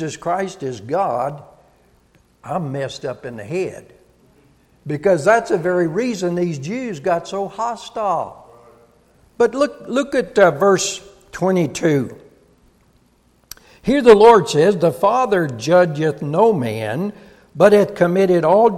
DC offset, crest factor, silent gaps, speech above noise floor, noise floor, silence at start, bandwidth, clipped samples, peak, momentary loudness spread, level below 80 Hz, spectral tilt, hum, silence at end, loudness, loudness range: under 0.1%; 18 dB; none; 40 dB; -57 dBFS; 0 s; 14.5 kHz; under 0.1%; 0 dBFS; 14 LU; -54 dBFS; -5.5 dB/octave; none; 0 s; -17 LUFS; 11 LU